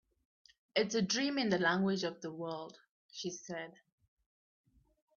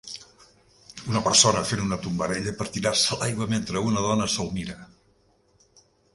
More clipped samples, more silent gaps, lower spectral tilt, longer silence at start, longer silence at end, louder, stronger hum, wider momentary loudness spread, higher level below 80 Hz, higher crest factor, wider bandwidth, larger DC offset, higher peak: neither; first, 2.89-3.09 s vs none; about the same, -3.5 dB/octave vs -3.5 dB/octave; first, 0.75 s vs 0.05 s; first, 1.45 s vs 1.3 s; second, -35 LUFS vs -24 LUFS; neither; second, 14 LU vs 21 LU; second, -76 dBFS vs -52 dBFS; about the same, 20 dB vs 24 dB; second, 7.4 kHz vs 11.5 kHz; neither; second, -18 dBFS vs -2 dBFS